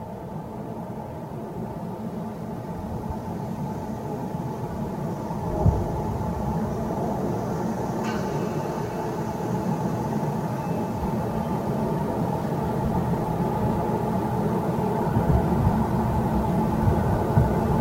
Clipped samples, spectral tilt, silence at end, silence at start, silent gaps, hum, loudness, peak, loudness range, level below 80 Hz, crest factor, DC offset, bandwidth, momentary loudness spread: under 0.1%; -8 dB/octave; 0 s; 0 s; none; none; -27 LUFS; -8 dBFS; 8 LU; -38 dBFS; 18 dB; under 0.1%; 16 kHz; 10 LU